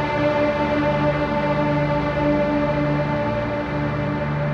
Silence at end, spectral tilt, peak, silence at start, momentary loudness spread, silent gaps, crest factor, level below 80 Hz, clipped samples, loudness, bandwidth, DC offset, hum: 0 s; -8 dB/octave; -8 dBFS; 0 s; 4 LU; none; 12 dB; -38 dBFS; under 0.1%; -21 LUFS; 7 kHz; under 0.1%; none